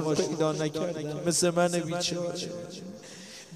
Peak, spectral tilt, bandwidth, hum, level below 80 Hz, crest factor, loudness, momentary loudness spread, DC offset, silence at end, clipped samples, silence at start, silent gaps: -14 dBFS; -4 dB/octave; 15.5 kHz; none; -66 dBFS; 16 dB; -29 LUFS; 18 LU; under 0.1%; 0 s; under 0.1%; 0 s; none